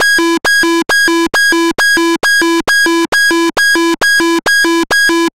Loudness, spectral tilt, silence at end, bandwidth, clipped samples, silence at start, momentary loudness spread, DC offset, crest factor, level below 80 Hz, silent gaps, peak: -9 LUFS; -1 dB/octave; 0 s; 16.5 kHz; under 0.1%; 0 s; 1 LU; 2%; 6 dB; -46 dBFS; 3.08-3.12 s; -4 dBFS